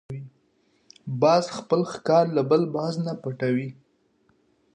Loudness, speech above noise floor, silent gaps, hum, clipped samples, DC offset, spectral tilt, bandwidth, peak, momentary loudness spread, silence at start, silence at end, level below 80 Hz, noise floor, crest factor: -24 LUFS; 43 dB; none; none; under 0.1%; under 0.1%; -6.5 dB/octave; 10 kHz; -8 dBFS; 17 LU; 0.1 s; 1 s; -68 dBFS; -66 dBFS; 18 dB